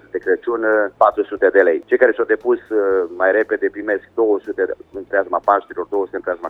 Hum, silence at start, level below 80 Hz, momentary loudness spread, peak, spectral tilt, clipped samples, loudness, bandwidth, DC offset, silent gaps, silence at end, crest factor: none; 0.15 s; -58 dBFS; 8 LU; 0 dBFS; -7 dB/octave; under 0.1%; -18 LUFS; 4 kHz; under 0.1%; none; 0 s; 18 dB